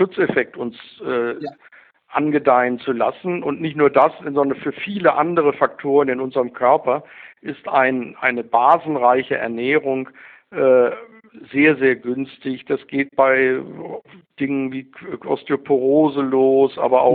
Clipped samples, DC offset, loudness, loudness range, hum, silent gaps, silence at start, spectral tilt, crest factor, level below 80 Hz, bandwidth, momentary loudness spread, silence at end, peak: under 0.1%; under 0.1%; -18 LUFS; 3 LU; none; none; 0 s; -9.5 dB/octave; 18 dB; -66 dBFS; 4.6 kHz; 15 LU; 0 s; 0 dBFS